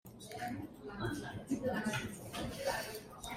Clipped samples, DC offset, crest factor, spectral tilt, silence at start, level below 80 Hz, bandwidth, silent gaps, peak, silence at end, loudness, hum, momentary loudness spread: under 0.1%; under 0.1%; 18 dB; -4.5 dB/octave; 0.05 s; -60 dBFS; 16 kHz; none; -22 dBFS; 0 s; -41 LUFS; none; 9 LU